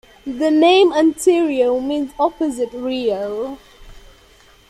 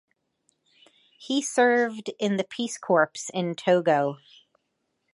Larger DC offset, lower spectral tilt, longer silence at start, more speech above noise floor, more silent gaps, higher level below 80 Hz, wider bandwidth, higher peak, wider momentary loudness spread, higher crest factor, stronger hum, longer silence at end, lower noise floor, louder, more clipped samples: neither; about the same, -3.5 dB/octave vs -4 dB/octave; second, 0.25 s vs 1.2 s; second, 33 dB vs 52 dB; neither; first, -50 dBFS vs -80 dBFS; first, 13.5 kHz vs 11.5 kHz; first, -2 dBFS vs -8 dBFS; first, 14 LU vs 9 LU; second, 14 dB vs 20 dB; neither; second, 0.7 s vs 1 s; second, -49 dBFS vs -77 dBFS; first, -17 LUFS vs -25 LUFS; neither